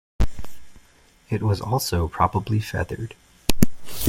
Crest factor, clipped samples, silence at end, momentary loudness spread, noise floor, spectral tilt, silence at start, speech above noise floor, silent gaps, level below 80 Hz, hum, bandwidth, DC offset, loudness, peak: 22 dB; under 0.1%; 0 s; 11 LU; -55 dBFS; -5.5 dB/octave; 0.2 s; 32 dB; none; -34 dBFS; none; 16.5 kHz; under 0.1%; -25 LUFS; 0 dBFS